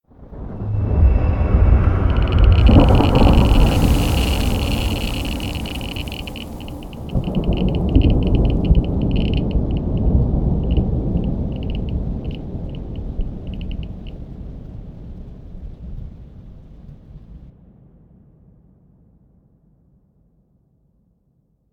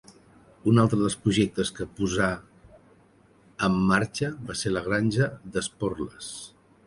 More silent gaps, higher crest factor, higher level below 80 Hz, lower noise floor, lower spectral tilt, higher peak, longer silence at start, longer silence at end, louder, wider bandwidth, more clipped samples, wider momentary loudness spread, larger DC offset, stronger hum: neither; about the same, 18 dB vs 20 dB; first, -20 dBFS vs -50 dBFS; first, -62 dBFS vs -58 dBFS; first, -7 dB/octave vs -5.5 dB/octave; first, 0 dBFS vs -6 dBFS; second, 0.2 s vs 0.65 s; first, 4.2 s vs 0.4 s; first, -19 LUFS vs -26 LUFS; first, 18 kHz vs 11.5 kHz; neither; first, 22 LU vs 15 LU; neither; neither